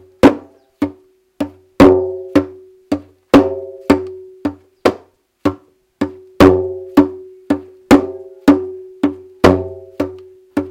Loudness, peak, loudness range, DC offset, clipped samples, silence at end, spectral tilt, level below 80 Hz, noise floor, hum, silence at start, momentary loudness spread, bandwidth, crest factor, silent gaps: -16 LUFS; 0 dBFS; 3 LU; under 0.1%; 0.6%; 0 s; -6.5 dB/octave; -42 dBFS; -46 dBFS; none; 0.25 s; 16 LU; 16.5 kHz; 16 dB; none